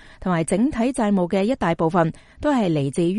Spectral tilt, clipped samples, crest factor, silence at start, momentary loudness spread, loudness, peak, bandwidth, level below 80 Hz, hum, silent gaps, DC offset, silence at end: -6.5 dB/octave; under 0.1%; 16 dB; 0.2 s; 4 LU; -21 LUFS; -4 dBFS; 11.5 kHz; -44 dBFS; none; none; under 0.1%; 0 s